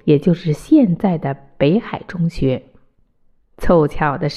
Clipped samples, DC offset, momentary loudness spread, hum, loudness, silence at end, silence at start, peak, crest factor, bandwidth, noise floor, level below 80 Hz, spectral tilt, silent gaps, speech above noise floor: under 0.1%; under 0.1%; 12 LU; none; -17 LUFS; 0 s; 0.05 s; -2 dBFS; 14 dB; 12.5 kHz; -56 dBFS; -34 dBFS; -8.5 dB/octave; none; 40 dB